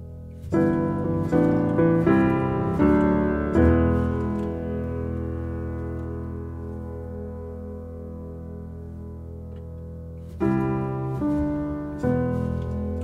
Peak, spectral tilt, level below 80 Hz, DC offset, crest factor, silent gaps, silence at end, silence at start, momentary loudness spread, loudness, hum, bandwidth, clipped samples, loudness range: -6 dBFS; -10 dB/octave; -36 dBFS; under 0.1%; 18 dB; none; 0 s; 0 s; 18 LU; -24 LUFS; none; 8.4 kHz; under 0.1%; 15 LU